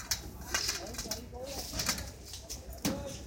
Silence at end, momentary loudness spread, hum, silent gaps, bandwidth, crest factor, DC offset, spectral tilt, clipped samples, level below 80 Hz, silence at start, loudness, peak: 0 s; 10 LU; none; none; 17 kHz; 22 dB; under 0.1%; -2 dB/octave; under 0.1%; -48 dBFS; 0 s; -36 LUFS; -16 dBFS